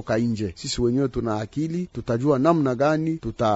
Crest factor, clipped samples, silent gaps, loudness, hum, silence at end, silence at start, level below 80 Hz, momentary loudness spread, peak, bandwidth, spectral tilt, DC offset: 18 dB; under 0.1%; none; -23 LUFS; none; 0 s; 0 s; -46 dBFS; 8 LU; -4 dBFS; 8 kHz; -6.5 dB/octave; under 0.1%